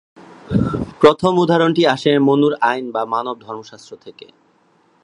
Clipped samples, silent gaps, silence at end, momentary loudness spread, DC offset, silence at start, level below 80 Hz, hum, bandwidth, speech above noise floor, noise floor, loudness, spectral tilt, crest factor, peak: under 0.1%; none; 0.9 s; 19 LU; under 0.1%; 0.5 s; -44 dBFS; none; 10.5 kHz; 41 dB; -57 dBFS; -16 LUFS; -6.5 dB/octave; 18 dB; 0 dBFS